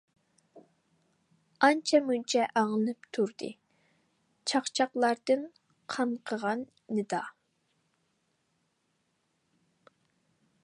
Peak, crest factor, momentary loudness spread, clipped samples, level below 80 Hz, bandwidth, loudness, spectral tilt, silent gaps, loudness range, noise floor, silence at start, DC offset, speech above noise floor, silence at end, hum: -8 dBFS; 26 dB; 11 LU; under 0.1%; -84 dBFS; 11.5 kHz; -30 LUFS; -3.5 dB/octave; none; 9 LU; -77 dBFS; 0.55 s; under 0.1%; 47 dB; 3.35 s; none